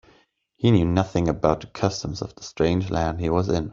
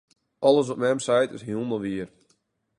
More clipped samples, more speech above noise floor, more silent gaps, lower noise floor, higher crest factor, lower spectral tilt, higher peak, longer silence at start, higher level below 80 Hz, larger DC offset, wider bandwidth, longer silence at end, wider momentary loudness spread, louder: neither; second, 39 dB vs 46 dB; neither; second, -61 dBFS vs -69 dBFS; about the same, 20 dB vs 20 dB; first, -7 dB/octave vs -5 dB/octave; about the same, -4 dBFS vs -6 dBFS; first, 0.6 s vs 0.4 s; first, -44 dBFS vs -64 dBFS; neither; second, 7.6 kHz vs 11.5 kHz; second, 0 s vs 0.7 s; about the same, 10 LU vs 11 LU; about the same, -23 LUFS vs -24 LUFS